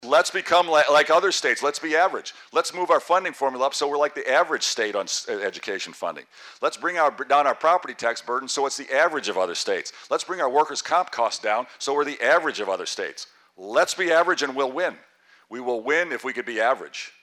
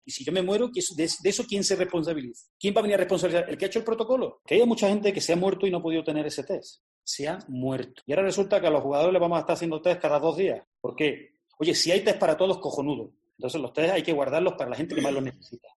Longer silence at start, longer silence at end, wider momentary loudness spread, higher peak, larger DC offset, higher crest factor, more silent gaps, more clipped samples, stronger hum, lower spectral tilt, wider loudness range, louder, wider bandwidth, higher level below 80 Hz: about the same, 0 s vs 0.05 s; about the same, 0.15 s vs 0.2 s; about the same, 10 LU vs 10 LU; about the same, -8 dBFS vs -10 dBFS; neither; about the same, 14 dB vs 16 dB; second, none vs 2.50-2.60 s, 6.80-7.02 s, 10.67-10.72 s; neither; neither; second, -1.5 dB/octave vs -4 dB/octave; about the same, 4 LU vs 3 LU; first, -23 LUFS vs -26 LUFS; first, 14.5 kHz vs 12 kHz; second, -78 dBFS vs -66 dBFS